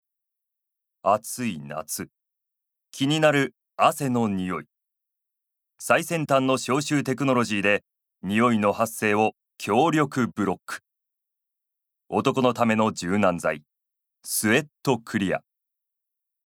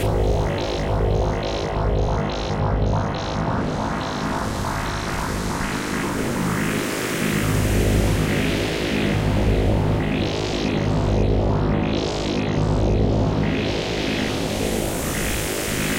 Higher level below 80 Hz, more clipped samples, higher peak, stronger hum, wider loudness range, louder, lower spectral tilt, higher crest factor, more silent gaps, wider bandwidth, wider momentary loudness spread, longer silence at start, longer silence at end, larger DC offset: second, -68 dBFS vs -28 dBFS; neither; about the same, -4 dBFS vs -6 dBFS; neither; about the same, 3 LU vs 3 LU; about the same, -24 LUFS vs -22 LUFS; about the same, -5 dB/octave vs -5.5 dB/octave; first, 22 dB vs 14 dB; neither; first, 18.5 kHz vs 16.5 kHz; first, 12 LU vs 5 LU; first, 1.05 s vs 0 s; first, 1.1 s vs 0 s; neither